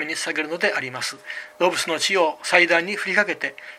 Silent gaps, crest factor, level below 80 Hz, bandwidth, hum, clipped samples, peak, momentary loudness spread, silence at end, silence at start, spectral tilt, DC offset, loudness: none; 22 dB; -74 dBFS; 15.5 kHz; none; under 0.1%; 0 dBFS; 11 LU; 0 s; 0 s; -2 dB/octave; under 0.1%; -21 LUFS